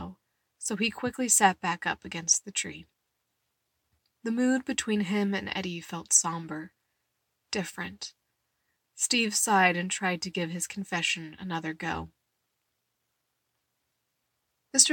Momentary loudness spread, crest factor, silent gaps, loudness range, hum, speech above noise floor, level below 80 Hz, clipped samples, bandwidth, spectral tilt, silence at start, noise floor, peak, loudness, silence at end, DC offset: 15 LU; 26 dB; none; 7 LU; none; 51 dB; -64 dBFS; under 0.1%; 17 kHz; -2 dB/octave; 0 s; -80 dBFS; -4 dBFS; -28 LUFS; 0 s; under 0.1%